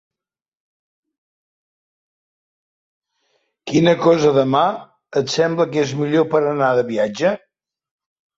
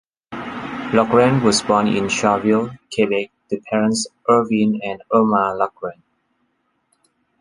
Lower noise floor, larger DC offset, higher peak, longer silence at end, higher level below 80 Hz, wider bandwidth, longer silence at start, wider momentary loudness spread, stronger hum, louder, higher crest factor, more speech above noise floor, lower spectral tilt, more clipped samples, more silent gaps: first, -90 dBFS vs -68 dBFS; neither; about the same, -2 dBFS vs -2 dBFS; second, 1 s vs 1.5 s; second, -62 dBFS vs -56 dBFS; second, 7.8 kHz vs 11.5 kHz; first, 3.65 s vs 0.3 s; second, 9 LU vs 14 LU; neither; about the same, -17 LUFS vs -18 LUFS; about the same, 18 dB vs 18 dB; first, 73 dB vs 50 dB; about the same, -6 dB/octave vs -5 dB/octave; neither; neither